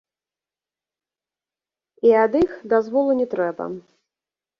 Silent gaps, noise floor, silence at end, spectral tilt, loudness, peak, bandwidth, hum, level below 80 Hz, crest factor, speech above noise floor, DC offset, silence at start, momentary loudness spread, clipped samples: none; under -90 dBFS; 0.8 s; -8 dB/octave; -20 LUFS; -6 dBFS; 6.2 kHz; none; -60 dBFS; 18 dB; over 71 dB; under 0.1%; 2.05 s; 15 LU; under 0.1%